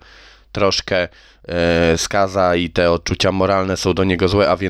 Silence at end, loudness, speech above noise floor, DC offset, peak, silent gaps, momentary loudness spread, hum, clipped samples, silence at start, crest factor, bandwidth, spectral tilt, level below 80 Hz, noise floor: 0 s; -17 LUFS; 28 dB; under 0.1%; -4 dBFS; none; 5 LU; none; under 0.1%; 0.55 s; 14 dB; 14.5 kHz; -5 dB/octave; -38 dBFS; -45 dBFS